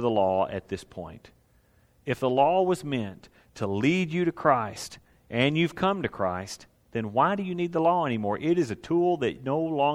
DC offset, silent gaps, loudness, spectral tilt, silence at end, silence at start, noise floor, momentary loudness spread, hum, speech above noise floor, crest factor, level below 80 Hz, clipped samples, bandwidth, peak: under 0.1%; none; -26 LUFS; -6 dB/octave; 0 s; 0 s; -63 dBFS; 14 LU; none; 36 dB; 20 dB; -60 dBFS; under 0.1%; 14.5 kHz; -6 dBFS